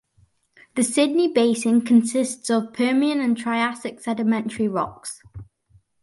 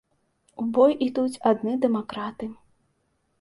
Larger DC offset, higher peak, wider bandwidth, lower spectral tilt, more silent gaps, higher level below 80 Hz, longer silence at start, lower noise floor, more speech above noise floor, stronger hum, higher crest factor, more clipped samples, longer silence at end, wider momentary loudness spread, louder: neither; about the same, -6 dBFS vs -6 dBFS; about the same, 11.5 kHz vs 11.5 kHz; second, -4 dB/octave vs -6.5 dB/octave; neither; first, -60 dBFS vs -66 dBFS; first, 0.75 s vs 0.6 s; second, -61 dBFS vs -71 dBFS; second, 40 dB vs 48 dB; neither; about the same, 16 dB vs 20 dB; neither; second, 0.6 s vs 0.9 s; about the same, 12 LU vs 13 LU; first, -21 LUFS vs -24 LUFS